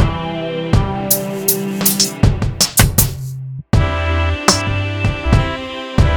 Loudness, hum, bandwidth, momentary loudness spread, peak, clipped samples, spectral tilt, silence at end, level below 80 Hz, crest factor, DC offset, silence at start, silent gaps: -16 LUFS; none; over 20 kHz; 9 LU; 0 dBFS; 0.2%; -4 dB/octave; 0 s; -24 dBFS; 16 dB; under 0.1%; 0 s; none